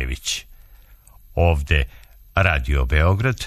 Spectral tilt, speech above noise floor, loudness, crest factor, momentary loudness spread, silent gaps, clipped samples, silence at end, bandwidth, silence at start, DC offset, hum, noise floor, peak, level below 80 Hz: -5 dB/octave; 29 dB; -21 LUFS; 20 dB; 9 LU; none; under 0.1%; 0 s; 13.5 kHz; 0 s; under 0.1%; none; -48 dBFS; -2 dBFS; -26 dBFS